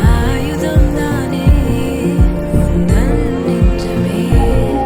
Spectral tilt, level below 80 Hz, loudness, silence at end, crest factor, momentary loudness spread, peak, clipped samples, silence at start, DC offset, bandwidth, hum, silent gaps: -7.5 dB/octave; -16 dBFS; -14 LUFS; 0 s; 12 dB; 4 LU; 0 dBFS; under 0.1%; 0 s; under 0.1%; 16.5 kHz; none; none